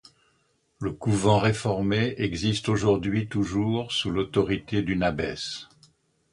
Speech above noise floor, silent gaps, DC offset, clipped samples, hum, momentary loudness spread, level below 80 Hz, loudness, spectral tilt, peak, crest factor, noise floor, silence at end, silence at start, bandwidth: 44 dB; none; under 0.1%; under 0.1%; none; 8 LU; -48 dBFS; -26 LUFS; -6 dB/octave; -6 dBFS; 20 dB; -69 dBFS; 0.7 s; 0.8 s; 11 kHz